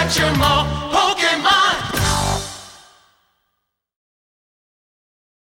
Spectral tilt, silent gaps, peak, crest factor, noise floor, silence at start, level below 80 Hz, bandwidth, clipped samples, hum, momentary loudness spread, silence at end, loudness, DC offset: -3 dB/octave; none; -4 dBFS; 16 dB; -74 dBFS; 0 s; -34 dBFS; 16.5 kHz; under 0.1%; none; 10 LU; 2.65 s; -16 LUFS; under 0.1%